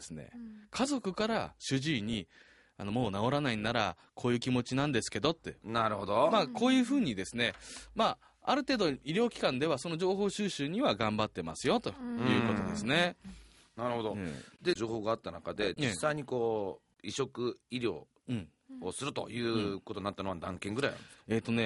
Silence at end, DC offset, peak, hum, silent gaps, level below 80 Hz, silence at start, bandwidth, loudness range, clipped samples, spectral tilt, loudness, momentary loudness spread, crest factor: 0 s; under 0.1%; -12 dBFS; none; none; -62 dBFS; 0 s; 11.5 kHz; 6 LU; under 0.1%; -5 dB/octave; -33 LUFS; 12 LU; 22 dB